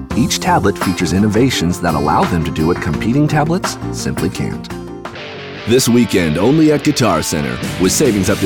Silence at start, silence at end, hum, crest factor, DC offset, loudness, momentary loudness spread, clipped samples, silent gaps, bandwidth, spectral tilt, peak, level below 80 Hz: 0 s; 0 s; none; 12 dB; 0.3%; -14 LUFS; 14 LU; under 0.1%; none; over 20 kHz; -5 dB/octave; -2 dBFS; -36 dBFS